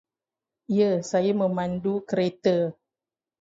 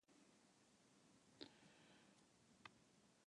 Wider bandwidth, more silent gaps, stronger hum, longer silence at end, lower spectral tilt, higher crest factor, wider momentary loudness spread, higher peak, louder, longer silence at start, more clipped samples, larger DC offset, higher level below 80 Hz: second, 7.8 kHz vs 10.5 kHz; neither; neither; first, 0.7 s vs 0 s; first, -6.5 dB/octave vs -3 dB/octave; second, 16 dB vs 34 dB; about the same, 5 LU vs 7 LU; first, -10 dBFS vs -36 dBFS; first, -25 LUFS vs -65 LUFS; first, 0.7 s vs 0.05 s; neither; neither; first, -64 dBFS vs under -90 dBFS